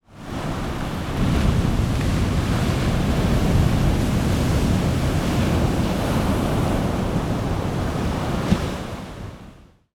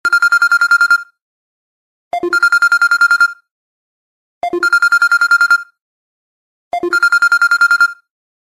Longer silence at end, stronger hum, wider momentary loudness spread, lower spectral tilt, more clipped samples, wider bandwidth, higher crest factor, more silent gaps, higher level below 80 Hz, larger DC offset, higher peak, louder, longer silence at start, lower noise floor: second, 0.4 s vs 0.55 s; neither; about the same, 8 LU vs 10 LU; first, -6.5 dB/octave vs -0.5 dB/octave; neither; first, 18.5 kHz vs 13.5 kHz; about the same, 16 dB vs 12 dB; second, none vs 1.22-2.11 s, 3.51-4.41 s, 5.82-6.71 s; first, -28 dBFS vs -62 dBFS; neither; about the same, -4 dBFS vs -2 dBFS; second, -22 LUFS vs -11 LUFS; about the same, 0.1 s vs 0.05 s; second, -46 dBFS vs under -90 dBFS